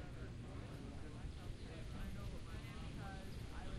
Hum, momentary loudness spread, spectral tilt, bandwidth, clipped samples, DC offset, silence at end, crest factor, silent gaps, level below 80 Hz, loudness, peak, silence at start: none; 2 LU; -6 dB/octave; 13.5 kHz; under 0.1%; under 0.1%; 0 s; 14 dB; none; -52 dBFS; -51 LUFS; -34 dBFS; 0 s